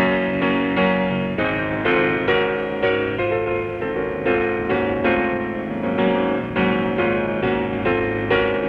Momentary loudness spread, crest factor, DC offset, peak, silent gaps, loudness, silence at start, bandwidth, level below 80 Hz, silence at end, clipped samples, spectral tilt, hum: 5 LU; 14 dB; under 0.1%; -6 dBFS; none; -20 LUFS; 0 s; 5.8 kHz; -44 dBFS; 0 s; under 0.1%; -8 dB/octave; none